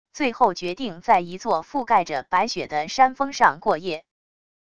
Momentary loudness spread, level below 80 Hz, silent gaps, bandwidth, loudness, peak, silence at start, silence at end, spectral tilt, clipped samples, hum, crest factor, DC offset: 9 LU; -58 dBFS; none; 11 kHz; -22 LUFS; -2 dBFS; 0.15 s; 0.75 s; -4 dB/octave; under 0.1%; none; 20 dB; 0.5%